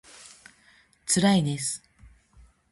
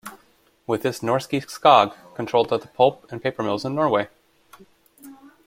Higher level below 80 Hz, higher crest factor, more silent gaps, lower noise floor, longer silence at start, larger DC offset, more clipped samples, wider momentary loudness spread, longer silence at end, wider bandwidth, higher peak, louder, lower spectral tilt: about the same, -60 dBFS vs -64 dBFS; about the same, 18 dB vs 22 dB; neither; about the same, -60 dBFS vs -59 dBFS; first, 0.25 s vs 0.05 s; neither; neither; first, 26 LU vs 14 LU; first, 0.95 s vs 0.3 s; second, 12 kHz vs 16.5 kHz; second, -10 dBFS vs -2 dBFS; second, -25 LUFS vs -21 LUFS; second, -4 dB/octave vs -5.5 dB/octave